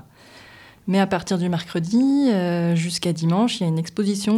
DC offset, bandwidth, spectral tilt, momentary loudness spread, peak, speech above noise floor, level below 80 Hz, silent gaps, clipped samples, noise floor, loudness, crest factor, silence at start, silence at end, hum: under 0.1%; 12.5 kHz; -6 dB/octave; 5 LU; -6 dBFS; 27 dB; -60 dBFS; none; under 0.1%; -47 dBFS; -21 LUFS; 14 dB; 0.35 s; 0 s; none